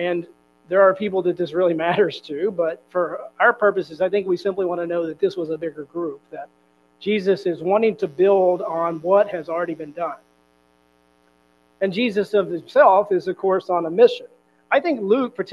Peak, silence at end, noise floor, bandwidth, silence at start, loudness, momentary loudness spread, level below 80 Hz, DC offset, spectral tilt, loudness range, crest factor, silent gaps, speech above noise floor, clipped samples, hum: -2 dBFS; 0 s; -60 dBFS; 7.2 kHz; 0 s; -21 LUFS; 12 LU; -70 dBFS; under 0.1%; -7 dB/octave; 6 LU; 18 dB; none; 40 dB; under 0.1%; none